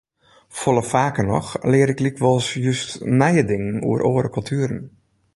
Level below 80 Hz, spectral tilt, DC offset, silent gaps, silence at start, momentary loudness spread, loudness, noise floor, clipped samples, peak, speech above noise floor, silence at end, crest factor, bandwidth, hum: -48 dBFS; -6 dB/octave; under 0.1%; none; 0.5 s; 7 LU; -20 LUFS; -53 dBFS; under 0.1%; -2 dBFS; 34 dB; 0.45 s; 18 dB; 11.5 kHz; none